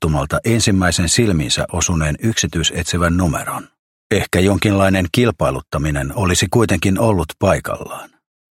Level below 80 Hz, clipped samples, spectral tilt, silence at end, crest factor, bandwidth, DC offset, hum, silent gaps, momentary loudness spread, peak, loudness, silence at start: -32 dBFS; under 0.1%; -4.5 dB/octave; 0.5 s; 16 dB; 16.5 kHz; under 0.1%; none; 3.79-4.10 s; 6 LU; 0 dBFS; -16 LUFS; 0 s